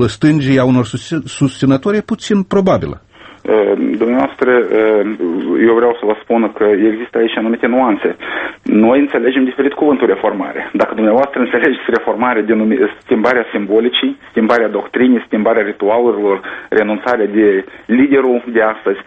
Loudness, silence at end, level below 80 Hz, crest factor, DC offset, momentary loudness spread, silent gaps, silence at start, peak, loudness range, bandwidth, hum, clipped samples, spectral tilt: -13 LUFS; 0.05 s; -48 dBFS; 12 dB; under 0.1%; 6 LU; none; 0 s; 0 dBFS; 1 LU; 8.8 kHz; none; under 0.1%; -6.5 dB/octave